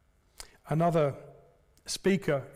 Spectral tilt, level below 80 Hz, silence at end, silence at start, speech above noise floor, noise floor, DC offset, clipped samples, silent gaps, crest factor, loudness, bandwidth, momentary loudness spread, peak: -6 dB/octave; -60 dBFS; 0.05 s; 0.4 s; 33 dB; -61 dBFS; under 0.1%; under 0.1%; none; 14 dB; -29 LUFS; 16 kHz; 22 LU; -16 dBFS